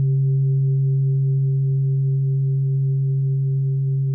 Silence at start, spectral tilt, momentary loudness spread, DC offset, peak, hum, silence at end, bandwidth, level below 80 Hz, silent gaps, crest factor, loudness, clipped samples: 0 s; -17 dB/octave; 2 LU; under 0.1%; -14 dBFS; none; 0 s; 0.4 kHz; -64 dBFS; none; 6 dB; -20 LUFS; under 0.1%